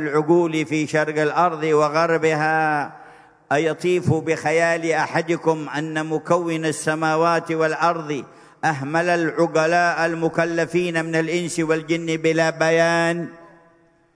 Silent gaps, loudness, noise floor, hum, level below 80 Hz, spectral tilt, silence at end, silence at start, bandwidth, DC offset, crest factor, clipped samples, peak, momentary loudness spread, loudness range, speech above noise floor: none; -20 LUFS; -56 dBFS; none; -66 dBFS; -5.5 dB/octave; 0.7 s; 0 s; 11 kHz; under 0.1%; 18 dB; under 0.1%; -4 dBFS; 6 LU; 1 LU; 37 dB